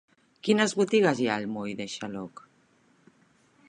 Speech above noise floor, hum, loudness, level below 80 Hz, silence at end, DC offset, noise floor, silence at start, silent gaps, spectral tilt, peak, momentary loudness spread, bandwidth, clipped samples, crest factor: 38 dB; none; -27 LUFS; -72 dBFS; 1.4 s; under 0.1%; -64 dBFS; 0.45 s; none; -4.5 dB/octave; -8 dBFS; 14 LU; 10.5 kHz; under 0.1%; 22 dB